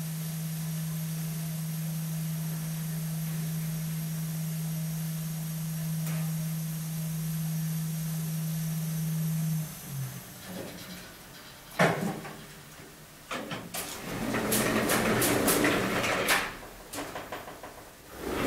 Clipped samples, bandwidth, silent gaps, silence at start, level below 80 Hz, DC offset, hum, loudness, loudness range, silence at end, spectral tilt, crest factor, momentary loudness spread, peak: under 0.1%; 16 kHz; none; 0 s; -56 dBFS; under 0.1%; none; -31 LUFS; 7 LU; 0 s; -4.5 dB/octave; 22 dB; 17 LU; -10 dBFS